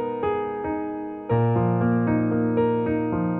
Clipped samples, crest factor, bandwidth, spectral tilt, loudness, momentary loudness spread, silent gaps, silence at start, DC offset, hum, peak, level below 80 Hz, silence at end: under 0.1%; 14 dB; 4 kHz; -12.5 dB/octave; -24 LUFS; 7 LU; none; 0 s; under 0.1%; none; -10 dBFS; -50 dBFS; 0 s